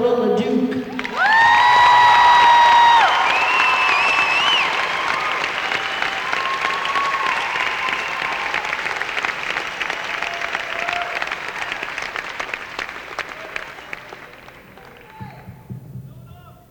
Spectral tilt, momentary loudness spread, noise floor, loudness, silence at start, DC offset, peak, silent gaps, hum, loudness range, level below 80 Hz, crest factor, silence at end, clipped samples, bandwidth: -2.5 dB/octave; 21 LU; -42 dBFS; -17 LUFS; 0 s; under 0.1%; -4 dBFS; none; none; 18 LU; -54 dBFS; 14 dB; 0.2 s; under 0.1%; 18 kHz